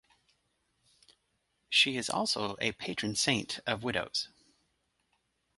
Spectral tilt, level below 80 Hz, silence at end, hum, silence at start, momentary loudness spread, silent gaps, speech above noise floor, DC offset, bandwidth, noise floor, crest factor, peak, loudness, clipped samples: -2.5 dB/octave; -66 dBFS; 1.3 s; none; 1.7 s; 9 LU; none; 46 dB; under 0.1%; 12 kHz; -78 dBFS; 24 dB; -12 dBFS; -30 LUFS; under 0.1%